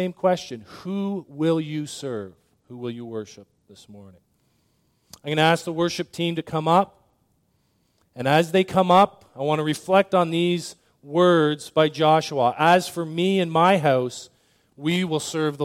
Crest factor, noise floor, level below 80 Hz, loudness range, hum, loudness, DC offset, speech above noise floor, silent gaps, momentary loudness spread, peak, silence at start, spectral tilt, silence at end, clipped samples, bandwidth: 18 dB; -67 dBFS; -66 dBFS; 10 LU; none; -22 LUFS; under 0.1%; 45 dB; none; 16 LU; -4 dBFS; 0 s; -5.5 dB/octave; 0 s; under 0.1%; 16 kHz